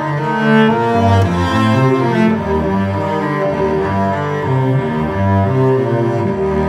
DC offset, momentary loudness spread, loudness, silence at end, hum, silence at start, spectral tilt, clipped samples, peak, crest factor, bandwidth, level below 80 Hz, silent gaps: under 0.1%; 5 LU; -14 LUFS; 0 s; none; 0 s; -8 dB/octave; under 0.1%; 0 dBFS; 14 dB; 11.5 kHz; -36 dBFS; none